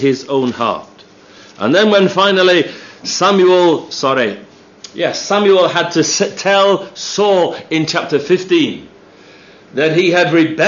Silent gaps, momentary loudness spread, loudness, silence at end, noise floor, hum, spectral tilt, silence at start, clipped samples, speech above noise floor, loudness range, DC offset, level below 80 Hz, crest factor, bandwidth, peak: none; 10 LU; -13 LUFS; 0 s; -41 dBFS; none; -4 dB/octave; 0 s; under 0.1%; 29 dB; 3 LU; under 0.1%; -64 dBFS; 14 dB; 7.4 kHz; 0 dBFS